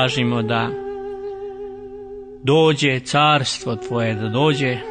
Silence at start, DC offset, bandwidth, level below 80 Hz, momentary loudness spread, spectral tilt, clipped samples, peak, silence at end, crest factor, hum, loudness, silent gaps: 0 s; under 0.1%; 9.6 kHz; -52 dBFS; 18 LU; -5 dB/octave; under 0.1%; -4 dBFS; 0 s; 16 dB; none; -19 LUFS; none